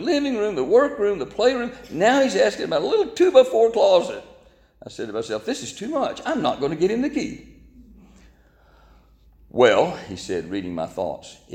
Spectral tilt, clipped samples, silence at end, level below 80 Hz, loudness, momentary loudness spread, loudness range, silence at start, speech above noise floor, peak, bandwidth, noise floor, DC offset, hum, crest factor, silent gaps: -4.5 dB/octave; under 0.1%; 0 s; -54 dBFS; -21 LUFS; 14 LU; 8 LU; 0 s; 34 dB; -2 dBFS; 11 kHz; -54 dBFS; under 0.1%; none; 20 dB; none